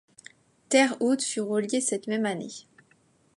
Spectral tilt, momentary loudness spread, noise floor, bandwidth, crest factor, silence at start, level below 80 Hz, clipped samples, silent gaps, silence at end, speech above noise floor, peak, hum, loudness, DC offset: -3 dB/octave; 13 LU; -64 dBFS; 11.5 kHz; 20 dB; 0.7 s; -80 dBFS; under 0.1%; none; 0.75 s; 38 dB; -8 dBFS; none; -26 LUFS; under 0.1%